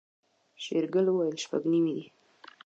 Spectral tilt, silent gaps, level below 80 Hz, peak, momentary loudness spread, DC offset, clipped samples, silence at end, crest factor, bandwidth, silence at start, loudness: -6 dB/octave; none; -86 dBFS; -16 dBFS; 9 LU; under 0.1%; under 0.1%; 0.6 s; 14 dB; 8 kHz; 0.6 s; -29 LUFS